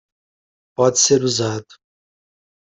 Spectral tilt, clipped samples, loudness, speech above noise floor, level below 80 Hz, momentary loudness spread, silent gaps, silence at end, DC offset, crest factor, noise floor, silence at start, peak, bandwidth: -3.5 dB/octave; under 0.1%; -16 LUFS; over 73 dB; -58 dBFS; 16 LU; none; 1 s; under 0.1%; 20 dB; under -90 dBFS; 0.8 s; -2 dBFS; 8.4 kHz